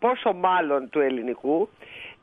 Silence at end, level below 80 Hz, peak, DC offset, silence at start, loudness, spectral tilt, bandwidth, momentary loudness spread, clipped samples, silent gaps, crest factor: 0.1 s; -68 dBFS; -8 dBFS; under 0.1%; 0 s; -24 LUFS; -7.5 dB/octave; 3.9 kHz; 11 LU; under 0.1%; none; 16 dB